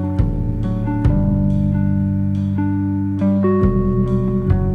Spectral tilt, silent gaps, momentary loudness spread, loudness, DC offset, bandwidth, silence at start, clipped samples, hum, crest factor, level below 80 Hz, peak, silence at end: -11 dB/octave; none; 4 LU; -18 LUFS; under 0.1%; 4 kHz; 0 s; under 0.1%; none; 14 dB; -26 dBFS; -4 dBFS; 0 s